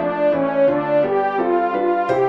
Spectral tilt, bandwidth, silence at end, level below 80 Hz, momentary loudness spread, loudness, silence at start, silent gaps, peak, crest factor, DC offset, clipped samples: -8 dB/octave; 6 kHz; 0 s; -60 dBFS; 2 LU; -18 LUFS; 0 s; none; -4 dBFS; 14 dB; 0.1%; under 0.1%